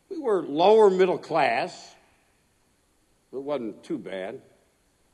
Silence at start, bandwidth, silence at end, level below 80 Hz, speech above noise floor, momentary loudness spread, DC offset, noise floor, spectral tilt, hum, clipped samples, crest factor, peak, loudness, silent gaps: 0.1 s; 10.5 kHz; 0.75 s; -74 dBFS; 43 dB; 20 LU; under 0.1%; -66 dBFS; -5.5 dB/octave; none; under 0.1%; 20 dB; -6 dBFS; -24 LUFS; none